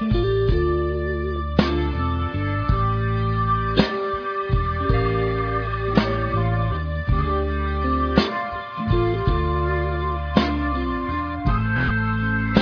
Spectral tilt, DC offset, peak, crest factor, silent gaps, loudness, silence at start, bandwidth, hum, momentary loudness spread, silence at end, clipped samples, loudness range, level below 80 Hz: -8.5 dB/octave; under 0.1%; -2 dBFS; 20 dB; none; -22 LUFS; 0 s; 5.4 kHz; none; 5 LU; 0 s; under 0.1%; 1 LU; -28 dBFS